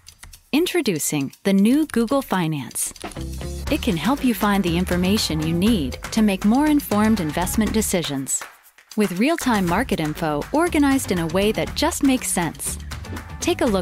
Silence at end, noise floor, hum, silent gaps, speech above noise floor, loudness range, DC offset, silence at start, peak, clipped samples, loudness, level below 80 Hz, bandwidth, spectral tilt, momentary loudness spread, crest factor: 0 s; -45 dBFS; none; none; 24 dB; 2 LU; under 0.1%; 0.25 s; -6 dBFS; under 0.1%; -21 LUFS; -38 dBFS; 16 kHz; -4.5 dB/octave; 8 LU; 14 dB